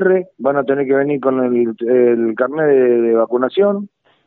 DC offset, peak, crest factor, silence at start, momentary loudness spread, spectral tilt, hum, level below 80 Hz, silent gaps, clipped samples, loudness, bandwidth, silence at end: under 0.1%; -2 dBFS; 14 dB; 0 s; 5 LU; -6 dB/octave; none; -72 dBFS; none; under 0.1%; -15 LUFS; 4.1 kHz; 0.4 s